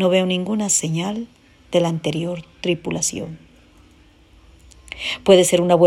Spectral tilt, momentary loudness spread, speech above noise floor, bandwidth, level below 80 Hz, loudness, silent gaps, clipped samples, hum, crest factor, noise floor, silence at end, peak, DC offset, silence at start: -4 dB/octave; 17 LU; 33 dB; 16 kHz; -52 dBFS; -19 LUFS; none; under 0.1%; none; 20 dB; -51 dBFS; 0 s; 0 dBFS; under 0.1%; 0 s